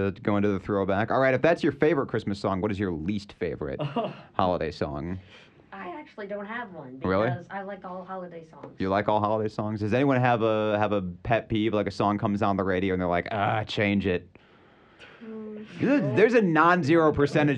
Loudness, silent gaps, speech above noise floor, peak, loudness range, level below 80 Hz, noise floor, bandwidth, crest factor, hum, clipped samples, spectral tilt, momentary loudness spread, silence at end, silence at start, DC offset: -26 LUFS; none; 30 dB; -6 dBFS; 7 LU; -54 dBFS; -56 dBFS; 9.4 kHz; 20 dB; none; under 0.1%; -7.5 dB/octave; 18 LU; 0 s; 0 s; under 0.1%